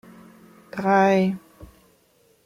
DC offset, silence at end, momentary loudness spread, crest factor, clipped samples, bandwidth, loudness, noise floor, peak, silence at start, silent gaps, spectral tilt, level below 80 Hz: under 0.1%; 0.8 s; 18 LU; 16 dB; under 0.1%; 12 kHz; -20 LUFS; -61 dBFS; -8 dBFS; 0.75 s; none; -7 dB/octave; -60 dBFS